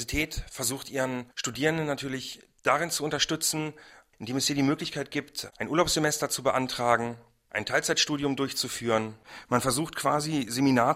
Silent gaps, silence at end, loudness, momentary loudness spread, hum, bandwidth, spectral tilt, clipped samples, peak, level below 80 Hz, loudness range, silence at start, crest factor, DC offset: none; 0 s; -28 LUFS; 10 LU; none; 16 kHz; -3.5 dB/octave; under 0.1%; -6 dBFS; -52 dBFS; 2 LU; 0 s; 22 dB; under 0.1%